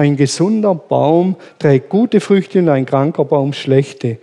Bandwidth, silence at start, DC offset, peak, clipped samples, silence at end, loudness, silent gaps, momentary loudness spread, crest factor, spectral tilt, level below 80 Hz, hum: 11 kHz; 0 s; under 0.1%; 0 dBFS; under 0.1%; 0.05 s; -14 LUFS; none; 3 LU; 12 dB; -7 dB/octave; -64 dBFS; none